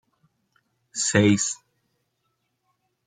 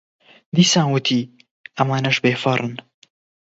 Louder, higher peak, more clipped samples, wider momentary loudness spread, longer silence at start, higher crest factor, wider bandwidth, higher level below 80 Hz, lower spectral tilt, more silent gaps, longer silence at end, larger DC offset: about the same, -21 LUFS vs -19 LUFS; second, -6 dBFS vs 0 dBFS; neither; about the same, 16 LU vs 18 LU; first, 0.95 s vs 0.55 s; about the same, 22 dB vs 20 dB; first, 9.6 kHz vs 8 kHz; about the same, -66 dBFS vs -62 dBFS; about the same, -4 dB/octave vs -4.5 dB/octave; second, none vs 1.51-1.64 s; first, 1.5 s vs 0.65 s; neither